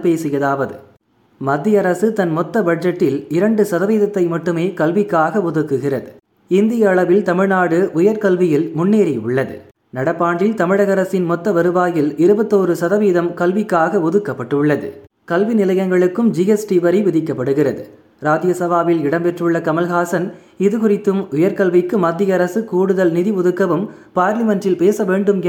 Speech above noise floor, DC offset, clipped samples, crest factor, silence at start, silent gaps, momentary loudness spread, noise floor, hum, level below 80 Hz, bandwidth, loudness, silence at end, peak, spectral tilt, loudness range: 39 dB; under 0.1%; under 0.1%; 14 dB; 0 s; none; 6 LU; -54 dBFS; none; -62 dBFS; 17 kHz; -16 LUFS; 0 s; -2 dBFS; -7.5 dB/octave; 2 LU